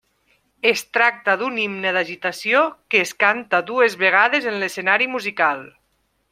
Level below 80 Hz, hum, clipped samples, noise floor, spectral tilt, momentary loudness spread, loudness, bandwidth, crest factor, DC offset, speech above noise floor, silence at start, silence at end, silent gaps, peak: -70 dBFS; none; under 0.1%; -67 dBFS; -3 dB/octave; 6 LU; -19 LUFS; 16 kHz; 20 dB; under 0.1%; 48 dB; 0.65 s; 0.65 s; none; 0 dBFS